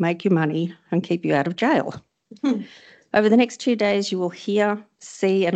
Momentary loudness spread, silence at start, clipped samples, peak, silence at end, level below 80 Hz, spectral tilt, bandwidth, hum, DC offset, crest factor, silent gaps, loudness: 10 LU; 0 s; under 0.1%; -2 dBFS; 0 s; -68 dBFS; -6 dB/octave; 8.8 kHz; none; under 0.1%; 20 dB; none; -22 LUFS